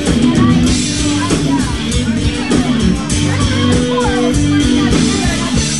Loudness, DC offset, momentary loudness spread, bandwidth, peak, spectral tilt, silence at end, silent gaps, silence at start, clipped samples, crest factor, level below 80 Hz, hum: -13 LUFS; 2%; 4 LU; 12 kHz; 0 dBFS; -5 dB/octave; 0 s; none; 0 s; under 0.1%; 12 dB; -24 dBFS; none